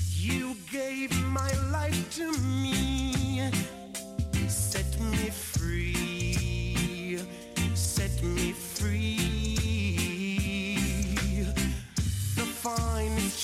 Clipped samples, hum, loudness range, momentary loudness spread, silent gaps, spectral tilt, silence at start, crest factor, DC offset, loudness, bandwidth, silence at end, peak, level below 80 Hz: under 0.1%; none; 1 LU; 4 LU; none; -4.5 dB/octave; 0 s; 14 dB; under 0.1%; -30 LUFS; 16 kHz; 0 s; -16 dBFS; -36 dBFS